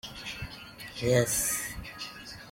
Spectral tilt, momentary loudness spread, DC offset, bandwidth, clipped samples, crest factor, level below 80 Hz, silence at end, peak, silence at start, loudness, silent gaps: -3.5 dB/octave; 17 LU; under 0.1%; 16.5 kHz; under 0.1%; 22 dB; -52 dBFS; 0 s; -12 dBFS; 0.05 s; -30 LUFS; none